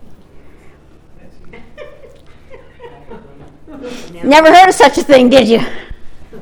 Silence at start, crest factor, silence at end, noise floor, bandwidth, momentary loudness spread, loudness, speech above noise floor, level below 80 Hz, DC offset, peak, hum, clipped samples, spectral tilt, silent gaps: 0 s; 12 dB; 0 s; -39 dBFS; over 20 kHz; 24 LU; -7 LUFS; 32 dB; -38 dBFS; under 0.1%; 0 dBFS; none; 1%; -4 dB/octave; none